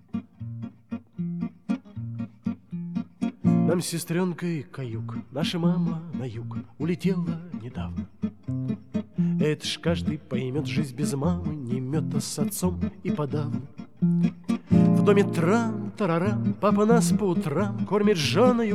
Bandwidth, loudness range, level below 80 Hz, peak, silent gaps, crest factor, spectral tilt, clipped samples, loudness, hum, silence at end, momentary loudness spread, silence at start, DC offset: 14 kHz; 7 LU; -56 dBFS; -6 dBFS; none; 20 dB; -6.5 dB/octave; under 0.1%; -26 LUFS; none; 0 s; 14 LU; 0.15 s; 0.3%